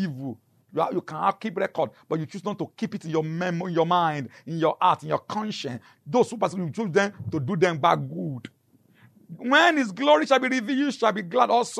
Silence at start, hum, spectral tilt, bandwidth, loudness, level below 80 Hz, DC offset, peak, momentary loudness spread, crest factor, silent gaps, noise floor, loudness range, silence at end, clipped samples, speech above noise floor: 0 s; none; -5.5 dB/octave; 13.5 kHz; -25 LUFS; -72 dBFS; under 0.1%; -6 dBFS; 13 LU; 20 dB; none; -59 dBFS; 5 LU; 0 s; under 0.1%; 34 dB